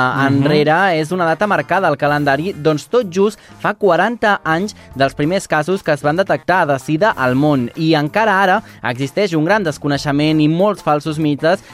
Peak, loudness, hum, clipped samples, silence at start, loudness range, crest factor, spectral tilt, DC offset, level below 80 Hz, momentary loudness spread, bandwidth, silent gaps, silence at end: -2 dBFS; -15 LUFS; none; under 0.1%; 0 s; 2 LU; 12 dB; -6 dB/octave; under 0.1%; -50 dBFS; 5 LU; 15.5 kHz; none; 0 s